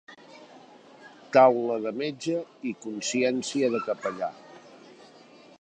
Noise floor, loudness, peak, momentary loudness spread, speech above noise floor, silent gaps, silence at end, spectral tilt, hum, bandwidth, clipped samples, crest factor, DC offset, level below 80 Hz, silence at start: -52 dBFS; -26 LUFS; -6 dBFS; 15 LU; 27 dB; none; 0.85 s; -4 dB/octave; none; 9.4 kHz; under 0.1%; 22 dB; under 0.1%; -78 dBFS; 0.1 s